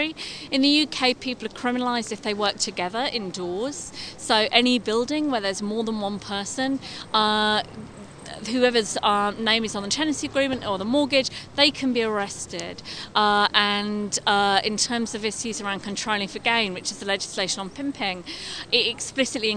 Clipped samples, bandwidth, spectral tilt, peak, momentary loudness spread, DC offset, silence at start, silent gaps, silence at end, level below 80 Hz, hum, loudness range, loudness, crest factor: under 0.1%; 11 kHz; -2.5 dB/octave; -2 dBFS; 12 LU; under 0.1%; 0 s; none; 0 s; -56 dBFS; none; 3 LU; -23 LUFS; 22 dB